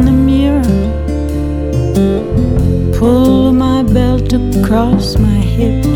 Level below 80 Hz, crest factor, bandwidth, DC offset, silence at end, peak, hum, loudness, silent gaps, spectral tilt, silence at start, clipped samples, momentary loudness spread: -18 dBFS; 10 dB; 17 kHz; under 0.1%; 0 s; 0 dBFS; none; -12 LUFS; none; -8 dB/octave; 0 s; under 0.1%; 7 LU